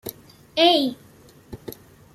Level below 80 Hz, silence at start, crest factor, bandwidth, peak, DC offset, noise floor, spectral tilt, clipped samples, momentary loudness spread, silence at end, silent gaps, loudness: -58 dBFS; 0.05 s; 22 dB; 15.5 kHz; -4 dBFS; under 0.1%; -49 dBFS; -4 dB/octave; under 0.1%; 25 LU; 0.45 s; none; -20 LUFS